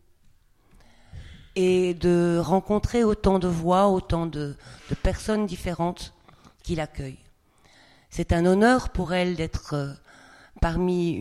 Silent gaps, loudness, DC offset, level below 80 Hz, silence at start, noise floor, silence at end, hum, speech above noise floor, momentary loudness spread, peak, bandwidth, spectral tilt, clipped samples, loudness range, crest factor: none; -24 LUFS; under 0.1%; -36 dBFS; 1.15 s; -58 dBFS; 0 s; none; 34 dB; 16 LU; -6 dBFS; 13 kHz; -6.5 dB/octave; under 0.1%; 8 LU; 20 dB